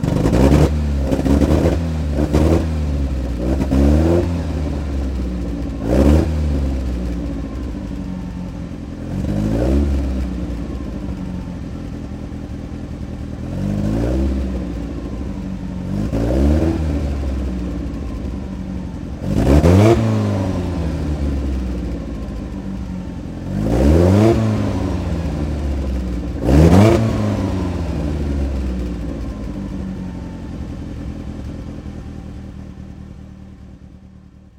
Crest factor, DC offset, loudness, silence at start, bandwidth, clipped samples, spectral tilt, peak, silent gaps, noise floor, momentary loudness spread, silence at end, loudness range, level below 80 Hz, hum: 18 dB; under 0.1%; -19 LUFS; 0 s; 13.5 kHz; under 0.1%; -8 dB/octave; 0 dBFS; none; -42 dBFS; 16 LU; 0.3 s; 11 LU; -24 dBFS; none